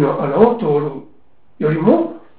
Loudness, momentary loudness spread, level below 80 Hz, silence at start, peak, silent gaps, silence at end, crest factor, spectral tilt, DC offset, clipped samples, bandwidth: -16 LUFS; 10 LU; -54 dBFS; 0 s; 0 dBFS; none; 0.2 s; 16 dB; -12.5 dB/octave; 0.8%; under 0.1%; 4 kHz